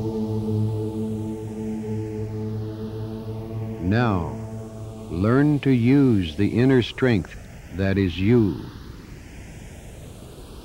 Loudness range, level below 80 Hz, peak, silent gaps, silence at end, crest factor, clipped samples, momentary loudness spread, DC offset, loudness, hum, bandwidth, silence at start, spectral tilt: 8 LU; -44 dBFS; -6 dBFS; none; 0 s; 16 dB; under 0.1%; 22 LU; under 0.1%; -23 LUFS; none; 16 kHz; 0 s; -8 dB/octave